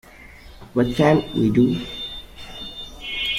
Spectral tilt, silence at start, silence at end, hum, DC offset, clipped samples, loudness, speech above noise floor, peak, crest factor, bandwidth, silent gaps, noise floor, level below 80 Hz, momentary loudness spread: -6.5 dB/octave; 0.15 s; 0 s; none; under 0.1%; under 0.1%; -21 LUFS; 25 dB; -4 dBFS; 18 dB; 15.5 kHz; none; -43 dBFS; -44 dBFS; 16 LU